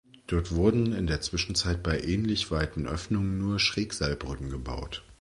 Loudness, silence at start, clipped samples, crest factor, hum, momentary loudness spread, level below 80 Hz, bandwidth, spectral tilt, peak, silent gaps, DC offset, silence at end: -29 LUFS; 0.3 s; under 0.1%; 20 dB; none; 10 LU; -38 dBFS; 11.5 kHz; -5 dB/octave; -10 dBFS; none; under 0.1%; 0.1 s